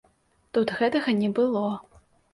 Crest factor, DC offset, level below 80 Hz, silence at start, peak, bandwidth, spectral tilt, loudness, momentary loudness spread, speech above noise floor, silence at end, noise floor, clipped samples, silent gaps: 16 dB; under 0.1%; -64 dBFS; 0.55 s; -12 dBFS; 11.5 kHz; -7 dB/octave; -25 LUFS; 7 LU; 41 dB; 0.5 s; -65 dBFS; under 0.1%; none